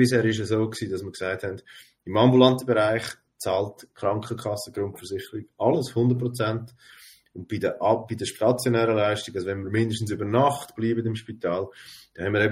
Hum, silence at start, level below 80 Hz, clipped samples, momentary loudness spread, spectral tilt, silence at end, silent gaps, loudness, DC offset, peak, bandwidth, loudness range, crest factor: none; 0 s; -62 dBFS; under 0.1%; 13 LU; -6 dB/octave; 0 s; none; -25 LUFS; under 0.1%; -2 dBFS; 16 kHz; 4 LU; 22 dB